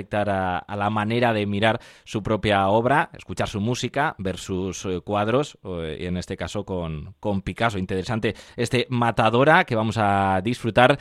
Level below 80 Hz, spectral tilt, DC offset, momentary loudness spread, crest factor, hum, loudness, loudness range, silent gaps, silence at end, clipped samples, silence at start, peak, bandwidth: -48 dBFS; -5.5 dB/octave; under 0.1%; 11 LU; 22 dB; none; -23 LUFS; 6 LU; none; 0 s; under 0.1%; 0 s; -2 dBFS; 13 kHz